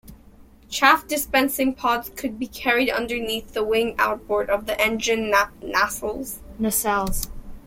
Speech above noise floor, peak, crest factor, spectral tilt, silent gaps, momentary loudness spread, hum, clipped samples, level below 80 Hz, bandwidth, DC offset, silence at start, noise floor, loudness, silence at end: 26 dB; 0 dBFS; 22 dB; -2.5 dB/octave; none; 10 LU; none; under 0.1%; -42 dBFS; 16.5 kHz; under 0.1%; 0.05 s; -49 dBFS; -22 LUFS; 0.05 s